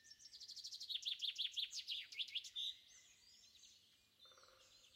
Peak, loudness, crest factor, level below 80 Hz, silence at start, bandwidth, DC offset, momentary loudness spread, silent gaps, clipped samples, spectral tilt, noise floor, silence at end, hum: -32 dBFS; -45 LUFS; 20 dB; under -90 dBFS; 0 s; 16 kHz; under 0.1%; 23 LU; none; under 0.1%; 3 dB/octave; -72 dBFS; 0 s; none